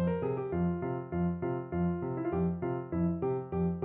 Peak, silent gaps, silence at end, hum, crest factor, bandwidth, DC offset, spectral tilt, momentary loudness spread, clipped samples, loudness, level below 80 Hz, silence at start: -20 dBFS; none; 0 s; none; 12 dB; 3.3 kHz; under 0.1%; -10 dB/octave; 3 LU; under 0.1%; -33 LUFS; -54 dBFS; 0 s